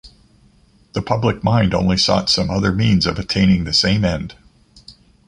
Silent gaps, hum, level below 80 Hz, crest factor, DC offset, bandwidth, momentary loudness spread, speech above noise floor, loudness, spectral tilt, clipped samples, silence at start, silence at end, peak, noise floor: none; none; -36 dBFS; 16 dB; under 0.1%; 10.5 kHz; 9 LU; 36 dB; -17 LUFS; -5.5 dB/octave; under 0.1%; 0.05 s; 0.35 s; -2 dBFS; -53 dBFS